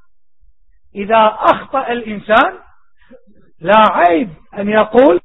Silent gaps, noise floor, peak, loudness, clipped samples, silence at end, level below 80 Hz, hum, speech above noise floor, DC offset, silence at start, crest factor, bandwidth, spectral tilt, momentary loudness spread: none; -53 dBFS; 0 dBFS; -13 LUFS; under 0.1%; 0.05 s; -48 dBFS; none; 41 dB; 0.5%; 0.95 s; 14 dB; 5.4 kHz; -7 dB/octave; 14 LU